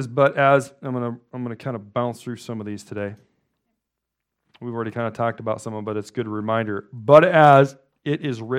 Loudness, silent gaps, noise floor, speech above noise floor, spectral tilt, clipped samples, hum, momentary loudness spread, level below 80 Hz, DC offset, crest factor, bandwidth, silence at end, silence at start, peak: -20 LUFS; none; -82 dBFS; 62 dB; -7 dB/octave; under 0.1%; none; 19 LU; -68 dBFS; under 0.1%; 22 dB; 12 kHz; 0 s; 0 s; 0 dBFS